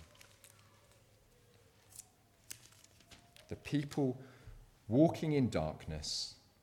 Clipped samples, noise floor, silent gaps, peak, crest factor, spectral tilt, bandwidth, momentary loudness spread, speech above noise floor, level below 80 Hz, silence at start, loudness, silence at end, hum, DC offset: under 0.1%; -67 dBFS; none; -16 dBFS; 24 dB; -6 dB/octave; 18 kHz; 28 LU; 32 dB; -60 dBFS; 0 s; -36 LUFS; 0.3 s; none; under 0.1%